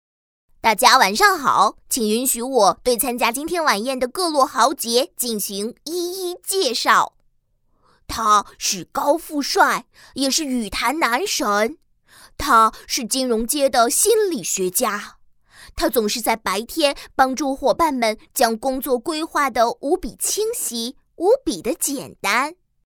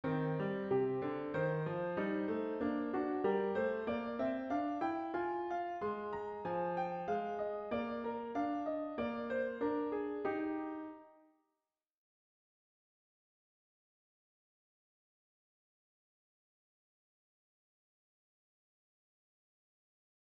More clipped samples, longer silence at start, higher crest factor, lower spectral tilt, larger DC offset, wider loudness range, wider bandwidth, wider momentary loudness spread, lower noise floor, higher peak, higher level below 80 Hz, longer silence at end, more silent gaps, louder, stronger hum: neither; first, 0.65 s vs 0.05 s; about the same, 20 dB vs 16 dB; second, -2 dB/octave vs -6 dB/octave; neither; second, 3 LU vs 6 LU; first, over 20 kHz vs 6.2 kHz; first, 9 LU vs 5 LU; second, -63 dBFS vs under -90 dBFS; first, 0 dBFS vs -24 dBFS; first, -48 dBFS vs -74 dBFS; second, 0.35 s vs 9.2 s; neither; first, -19 LUFS vs -38 LUFS; neither